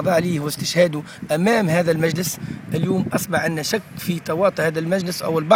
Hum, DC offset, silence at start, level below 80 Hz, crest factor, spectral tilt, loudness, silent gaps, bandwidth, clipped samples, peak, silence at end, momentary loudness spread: none; under 0.1%; 0 s; -56 dBFS; 20 dB; -5 dB/octave; -21 LUFS; none; 19.5 kHz; under 0.1%; 0 dBFS; 0 s; 7 LU